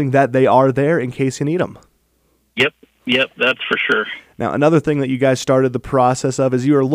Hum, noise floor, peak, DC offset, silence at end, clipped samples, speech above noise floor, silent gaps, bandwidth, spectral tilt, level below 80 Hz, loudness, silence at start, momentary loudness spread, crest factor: none; -61 dBFS; 0 dBFS; under 0.1%; 0 s; under 0.1%; 45 dB; none; 15 kHz; -5.5 dB/octave; -50 dBFS; -16 LUFS; 0 s; 8 LU; 16 dB